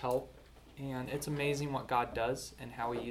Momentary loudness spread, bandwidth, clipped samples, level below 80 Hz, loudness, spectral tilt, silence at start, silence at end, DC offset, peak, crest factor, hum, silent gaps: 12 LU; 19 kHz; under 0.1%; -58 dBFS; -37 LUFS; -5 dB/octave; 0 s; 0 s; under 0.1%; -18 dBFS; 18 dB; none; none